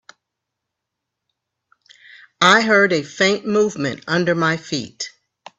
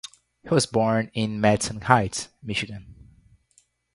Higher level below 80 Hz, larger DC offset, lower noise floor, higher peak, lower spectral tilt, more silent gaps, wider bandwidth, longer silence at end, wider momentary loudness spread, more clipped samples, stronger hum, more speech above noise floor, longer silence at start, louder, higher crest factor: second, -62 dBFS vs -52 dBFS; neither; first, -81 dBFS vs -64 dBFS; about the same, 0 dBFS vs 0 dBFS; about the same, -4 dB/octave vs -4.5 dB/octave; neither; second, 8.6 kHz vs 11.5 kHz; second, 0.5 s vs 1 s; about the same, 14 LU vs 13 LU; neither; neither; first, 63 dB vs 40 dB; first, 2.4 s vs 0.45 s; first, -17 LUFS vs -24 LUFS; about the same, 20 dB vs 24 dB